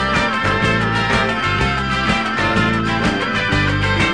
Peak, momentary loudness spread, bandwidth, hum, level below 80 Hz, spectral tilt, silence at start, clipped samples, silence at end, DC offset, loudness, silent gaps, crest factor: -4 dBFS; 2 LU; 10.5 kHz; none; -30 dBFS; -5 dB/octave; 0 s; under 0.1%; 0 s; 0.7%; -16 LUFS; none; 14 dB